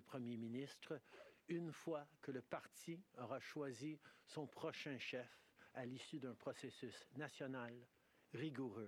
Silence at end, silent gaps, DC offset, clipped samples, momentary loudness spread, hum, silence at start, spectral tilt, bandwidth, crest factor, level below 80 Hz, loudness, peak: 0 s; none; under 0.1%; under 0.1%; 7 LU; none; 0 s; -5.5 dB/octave; 17.5 kHz; 20 dB; under -90 dBFS; -52 LUFS; -32 dBFS